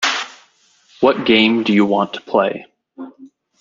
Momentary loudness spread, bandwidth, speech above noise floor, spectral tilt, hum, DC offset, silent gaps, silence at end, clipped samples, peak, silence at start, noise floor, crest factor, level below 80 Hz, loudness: 23 LU; 7.6 kHz; 39 dB; -4.5 dB/octave; none; under 0.1%; none; 0.35 s; under 0.1%; -2 dBFS; 0 s; -55 dBFS; 16 dB; -60 dBFS; -16 LUFS